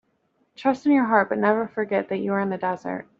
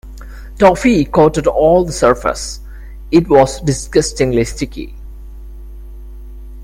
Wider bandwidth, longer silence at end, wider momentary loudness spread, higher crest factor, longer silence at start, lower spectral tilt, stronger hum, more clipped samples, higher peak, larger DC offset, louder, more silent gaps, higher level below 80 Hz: second, 7.4 kHz vs 16 kHz; first, 0.15 s vs 0 s; second, 8 LU vs 24 LU; first, 20 dB vs 14 dB; first, 0.6 s vs 0.05 s; about the same, -5.5 dB/octave vs -5.5 dB/octave; neither; neither; second, -4 dBFS vs 0 dBFS; neither; second, -23 LUFS vs -13 LUFS; neither; second, -70 dBFS vs -30 dBFS